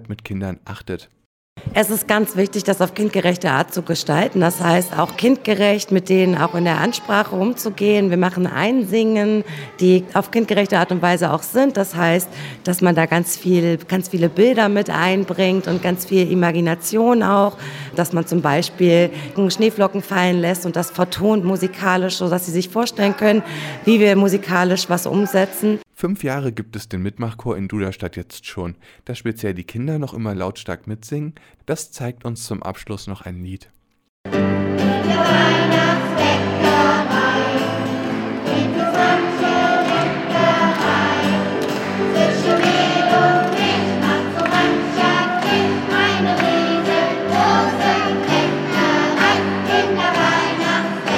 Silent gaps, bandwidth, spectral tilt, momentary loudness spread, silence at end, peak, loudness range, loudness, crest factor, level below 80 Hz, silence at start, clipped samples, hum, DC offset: 1.26-1.56 s, 34.09-34.24 s; 17 kHz; -5 dB/octave; 12 LU; 0 s; 0 dBFS; 10 LU; -17 LUFS; 18 dB; -56 dBFS; 0 s; under 0.1%; none; under 0.1%